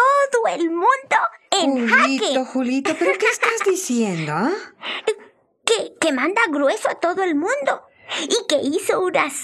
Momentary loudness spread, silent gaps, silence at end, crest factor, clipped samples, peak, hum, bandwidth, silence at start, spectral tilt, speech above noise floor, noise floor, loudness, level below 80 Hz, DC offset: 8 LU; none; 0 s; 18 dB; under 0.1%; -2 dBFS; none; 14.5 kHz; 0 s; -3 dB/octave; 29 dB; -49 dBFS; -19 LUFS; -76 dBFS; under 0.1%